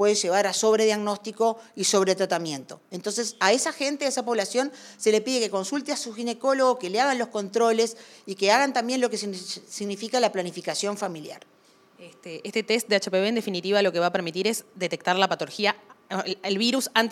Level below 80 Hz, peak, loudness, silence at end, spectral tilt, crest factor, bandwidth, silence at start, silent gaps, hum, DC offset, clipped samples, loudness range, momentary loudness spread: -82 dBFS; -4 dBFS; -25 LUFS; 0 s; -3 dB/octave; 22 dB; 16 kHz; 0 s; none; none; under 0.1%; under 0.1%; 4 LU; 11 LU